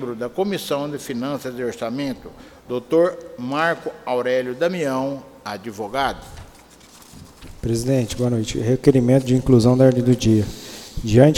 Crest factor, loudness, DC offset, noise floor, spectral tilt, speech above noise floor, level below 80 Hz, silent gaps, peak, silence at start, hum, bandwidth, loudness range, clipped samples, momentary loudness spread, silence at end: 20 dB; -20 LUFS; under 0.1%; -47 dBFS; -6.5 dB/octave; 27 dB; -42 dBFS; none; 0 dBFS; 0 s; none; 16.5 kHz; 9 LU; under 0.1%; 16 LU; 0 s